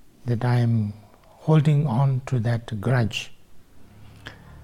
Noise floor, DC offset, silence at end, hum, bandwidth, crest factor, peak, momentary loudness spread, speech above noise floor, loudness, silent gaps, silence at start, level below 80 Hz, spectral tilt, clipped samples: -46 dBFS; under 0.1%; 0.05 s; none; 11 kHz; 16 dB; -8 dBFS; 22 LU; 25 dB; -23 LUFS; none; 0.25 s; -54 dBFS; -7.5 dB/octave; under 0.1%